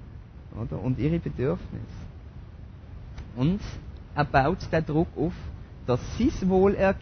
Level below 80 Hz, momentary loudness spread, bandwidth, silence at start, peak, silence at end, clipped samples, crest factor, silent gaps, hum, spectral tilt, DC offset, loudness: -40 dBFS; 22 LU; 6.6 kHz; 0 s; -8 dBFS; 0 s; under 0.1%; 18 dB; none; none; -8 dB/octave; under 0.1%; -26 LUFS